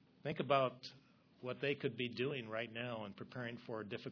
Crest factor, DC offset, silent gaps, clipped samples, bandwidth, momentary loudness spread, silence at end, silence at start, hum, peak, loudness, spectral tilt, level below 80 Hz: 22 dB; under 0.1%; none; under 0.1%; 5.4 kHz; 13 LU; 0 s; 0.25 s; none; -20 dBFS; -41 LUFS; -4 dB/octave; -82 dBFS